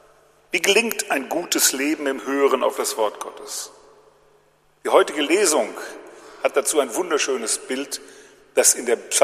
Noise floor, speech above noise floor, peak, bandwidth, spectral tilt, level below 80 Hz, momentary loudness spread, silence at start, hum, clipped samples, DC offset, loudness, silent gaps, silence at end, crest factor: -59 dBFS; 38 dB; 0 dBFS; 15 kHz; -0.5 dB/octave; -70 dBFS; 14 LU; 0.55 s; none; under 0.1%; under 0.1%; -20 LUFS; none; 0 s; 22 dB